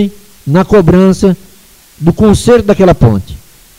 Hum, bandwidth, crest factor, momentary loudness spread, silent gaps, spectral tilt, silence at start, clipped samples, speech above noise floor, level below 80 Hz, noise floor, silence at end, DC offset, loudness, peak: none; 16 kHz; 8 dB; 11 LU; none; -7.5 dB/octave; 0 s; 0.3%; 34 dB; -26 dBFS; -41 dBFS; 0.4 s; under 0.1%; -8 LUFS; 0 dBFS